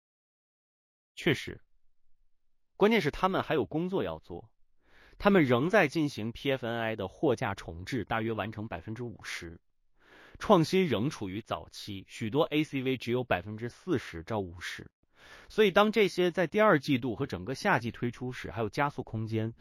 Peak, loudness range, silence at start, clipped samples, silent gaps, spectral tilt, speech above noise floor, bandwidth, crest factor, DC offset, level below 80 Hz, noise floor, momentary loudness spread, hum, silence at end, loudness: -8 dBFS; 6 LU; 1.15 s; under 0.1%; 14.93-15.03 s; -6 dB/octave; 37 dB; 16 kHz; 24 dB; under 0.1%; -58 dBFS; -67 dBFS; 15 LU; none; 0.05 s; -30 LUFS